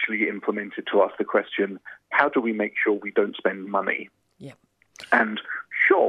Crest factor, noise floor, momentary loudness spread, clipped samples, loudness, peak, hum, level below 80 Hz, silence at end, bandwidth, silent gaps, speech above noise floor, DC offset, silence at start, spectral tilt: 22 dB; -48 dBFS; 9 LU; under 0.1%; -24 LUFS; -2 dBFS; none; -76 dBFS; 0 s; 10 kHz; none; 23 dB; under 0.1%; 0 s; -6 dB/octave